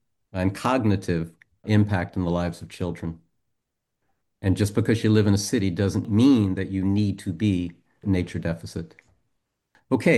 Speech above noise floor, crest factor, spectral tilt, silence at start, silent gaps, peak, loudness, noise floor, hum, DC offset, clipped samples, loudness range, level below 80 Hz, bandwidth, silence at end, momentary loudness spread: 57 dB; 18 dB; -6.5 dB/octave; 0.35 s; none; -6 dBFS; -24 LUFS; -80 dBFS; none; under 0.1%; under 0.1%; 6 LU; -50 dBFS; 12.5 kHz; 0 s; 15 LU